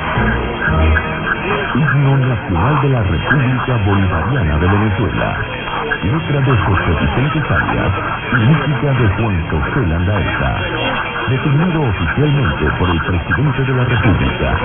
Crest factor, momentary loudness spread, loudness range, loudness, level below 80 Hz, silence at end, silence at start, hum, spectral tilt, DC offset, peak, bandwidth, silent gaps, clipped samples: 14 dB; 4 LU; 1 LU; -15 LUFS; -26 dBFS; 0 s; 0 s; none; -11 dB/octave; under 0.1%; -2 dBFS; 3.8 kHz; none; under 0.1%